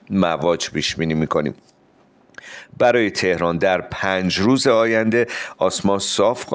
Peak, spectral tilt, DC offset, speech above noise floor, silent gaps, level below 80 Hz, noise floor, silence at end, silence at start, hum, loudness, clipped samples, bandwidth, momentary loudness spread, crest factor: -4 dBFS; -4.5 dB/octave; under 0.1%; 36 dB; none; -50 dBFS; -55 dBFS; 0 s; 0.1 s; none; -19 LUFS; under 0.1%; 10 kHz; 6 LU; 16 dB